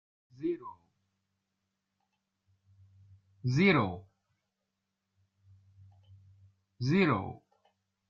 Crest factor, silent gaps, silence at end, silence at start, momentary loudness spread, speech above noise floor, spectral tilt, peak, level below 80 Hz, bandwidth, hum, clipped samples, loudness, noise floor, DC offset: 24 dB; none; 0.75 s; 0.4 s; 21 LU; 57 dB; -7.5 dB/octave; -12 dBFS; -70 dBFS; 7.4 kHz; none; under 0.1%; -30 LUFS; -85 dBFS; under 0.1%